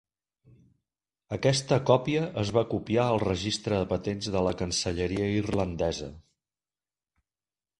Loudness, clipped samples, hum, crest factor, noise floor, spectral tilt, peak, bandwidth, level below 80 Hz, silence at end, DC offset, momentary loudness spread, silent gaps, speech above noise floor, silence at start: -28 LUFS; under 0.1%; none; 24 dB; under -90 dBFS; -5.5 dB/octave; -6 dBFS; 11.5 kHz; -48 dBFS; 1.6 s; under 0.1%; 6 LU; none; over 63 dB; 1.3 s